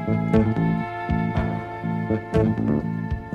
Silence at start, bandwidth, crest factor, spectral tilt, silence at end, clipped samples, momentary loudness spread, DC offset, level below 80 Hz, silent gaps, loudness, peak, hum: 0 s; 6.8 kHz; 18 dB; -9.5 dB/octave; 0 s; under 0.1%; 7 LU; under 0.1%; -38 dBFS; none; -24 LUFS; -6 dBFS; none